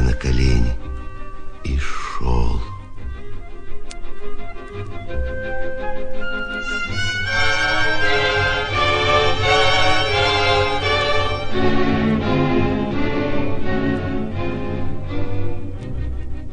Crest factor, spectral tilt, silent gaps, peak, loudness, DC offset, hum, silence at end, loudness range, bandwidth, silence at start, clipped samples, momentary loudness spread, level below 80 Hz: 16 dB; -5 dB/octave; none; -2 dBFS; -20 LUFS; under 0.1%; none; 0 s; 12 LU; 9.8 kHz; 0 s; under 0.1%; 19 LU; -28 dBFS